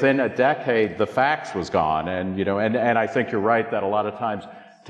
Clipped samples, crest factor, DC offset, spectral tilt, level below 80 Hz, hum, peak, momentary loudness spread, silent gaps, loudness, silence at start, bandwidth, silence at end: under 0.1%; 16 dB; under 0.1%; -6.5 dB/octave; -56 dBFS; none; -6 dBFS; 6 LU; none; -22 LUFS; 0 s; 10 kHz; 0 s